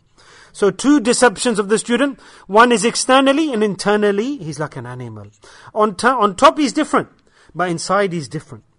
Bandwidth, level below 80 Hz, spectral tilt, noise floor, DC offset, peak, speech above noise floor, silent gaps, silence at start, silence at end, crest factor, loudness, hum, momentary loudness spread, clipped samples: 11 kHz; -54 dBFS; -4 dB/octave; -47 dBFS; under 0.1%; 0 dBFS; 30 dB; none; 0.55 s; 0.2 s; 16 dB; -16 LUFS; none; 16 LU; under 0.1%